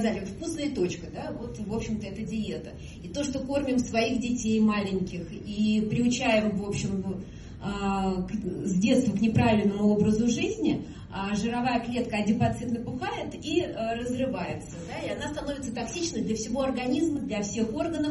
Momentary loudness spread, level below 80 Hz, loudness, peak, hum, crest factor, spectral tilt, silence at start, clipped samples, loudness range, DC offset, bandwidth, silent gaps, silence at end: 12 LU; -48 dBFS; -28 LUFS; -10 dBFS; none; 16 dB; -5.5 dB/octave; 0 s; under 0.1%; 6 LU; under 0.1%; 11.5 kHz; none; 0 s